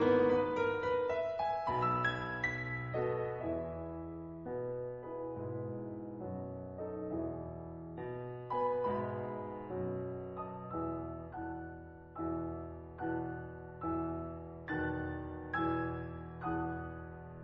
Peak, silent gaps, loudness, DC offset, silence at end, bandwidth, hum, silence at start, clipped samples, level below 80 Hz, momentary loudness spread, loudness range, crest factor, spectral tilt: -18 dBFS; none; -38 LUFS; under 0.1%; 0 s; 7.2 kHz; none; 0 s; under 0.1%; -58 dBFS; 12 LU; 7 LU; 20 dB; -6 dB/octave